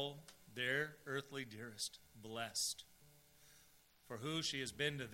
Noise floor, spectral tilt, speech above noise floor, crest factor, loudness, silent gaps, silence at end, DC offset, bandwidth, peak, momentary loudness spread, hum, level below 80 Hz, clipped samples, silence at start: -69 dBFS; -2.5 dB/octave; 25 dB; 22 dB; -43 LUFS; none; 0 s; under 0.1%; 16 kHz; -24 dBFS; 14 LU; none; -76 dBFS; under 0.1%; 0 s